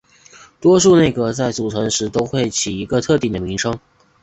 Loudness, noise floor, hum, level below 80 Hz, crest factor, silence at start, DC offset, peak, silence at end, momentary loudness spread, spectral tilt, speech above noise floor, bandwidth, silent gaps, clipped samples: -17 LUFS; -46 dBFS; none; -44 dBFS; 16 dB; 0.6 s; under 0.1%; -2 dBFS; 0.45 s; 10 LU; -4.5 dB/octave; 29 dB; 8.4 kHz; none; under 0.1%